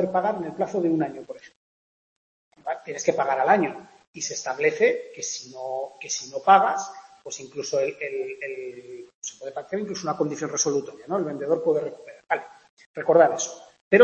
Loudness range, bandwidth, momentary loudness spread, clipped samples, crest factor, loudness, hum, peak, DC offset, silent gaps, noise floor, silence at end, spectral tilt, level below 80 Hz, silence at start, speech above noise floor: 5 LU; 8.4 kHz; 19 LU; under 0.1%; 24 dB; -25 LUFS; none; -2 dBFS; under 0.1%; 1.56-2.51 s, 4.07-4.14 s, 9.14-9.22 s, 12.69-12.77 s, 12.86-12.94 s, 13.81-13.91 s; under -90 dBFS; 0 s; -3.5 dB/octave; -74 dBFS; 0 s; over 65 dB